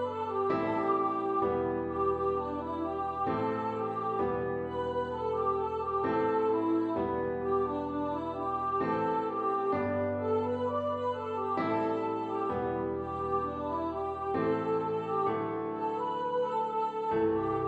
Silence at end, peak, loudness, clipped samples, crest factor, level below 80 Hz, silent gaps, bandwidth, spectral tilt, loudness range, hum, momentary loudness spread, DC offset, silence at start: 0 s; -18 dBFS; -32 LUFS; under 0.1%; 14 dB; -62 dBFS; none; 8 kHz; -8.5 dB/octave; 2 LU; none; 5 LU; under 0.1%; 0 s